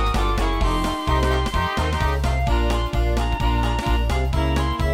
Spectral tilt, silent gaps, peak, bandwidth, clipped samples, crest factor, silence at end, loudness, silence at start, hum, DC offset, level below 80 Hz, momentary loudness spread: -6 dB/octave; none; -8 dBFS; 15.5 kHz; under 0.1%; 12 dB; 0 s; -22 LUFS; 0 s; none; under 0.1%; -22 dBFS; 1 LU